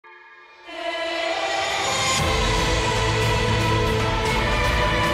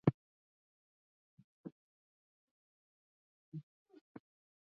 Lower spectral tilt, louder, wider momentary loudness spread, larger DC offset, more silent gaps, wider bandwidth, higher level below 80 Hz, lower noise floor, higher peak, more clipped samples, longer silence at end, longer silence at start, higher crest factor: second, -4 dB/octave vs -9.5 dB/octave; first, -21 LUFS vs -46 LUFS; second, 5 LU vs 15 LU; neither; second, none vs 0.14-1.37 s, 1.44-1.64 s, 1.72-3.52 s; first, 16 kHz vs 5 kHz; first, -30 dBFS vs -76 dBFS; second, -46 dBFS vs under -90 dBFS; first, -10 dBFS vs -14 dBFS; neither; second, 0 s vs 1.05 s; about the same, 0.05 s vs 0.05 s; second, 12 dB vs 32 dB